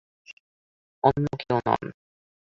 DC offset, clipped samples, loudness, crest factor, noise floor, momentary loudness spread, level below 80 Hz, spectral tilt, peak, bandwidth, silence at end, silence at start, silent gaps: under 0.1%; under 0.1%; -25 LUFS; 24 dB; under -90 dBFS; 6 LU; -56 dBFS; -8 dB/octave; -4 dBFS; 7.4 kHz; 0.65 s; 0.3 s; 0.33-1.02 s